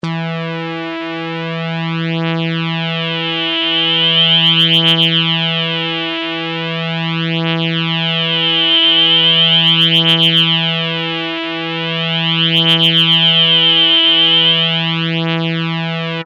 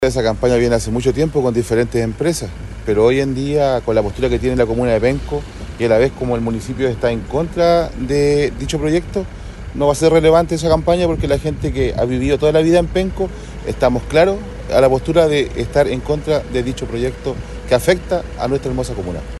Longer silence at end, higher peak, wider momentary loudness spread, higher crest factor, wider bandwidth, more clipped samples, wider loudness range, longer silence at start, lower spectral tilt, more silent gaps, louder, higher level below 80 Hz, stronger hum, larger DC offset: about the same, 0 s vs 0 s; about the same, 0 dBFS vs 0 dBFS; about the same, 11 LU vs 10 LU; about the same, 14 dB vs 16 dB; about the same, 12.5 kHz vs 12.5 kHz; neither; first, 7 LU vs 2 LU; about the same, 0.05 s vs 0 s; about the same, -5.5 dB/octave vs -6 dB/octave; neither; first, -12 LUFS vs -17 LUFS; second, -66 dBFS vs -30 dBFS; neither; neither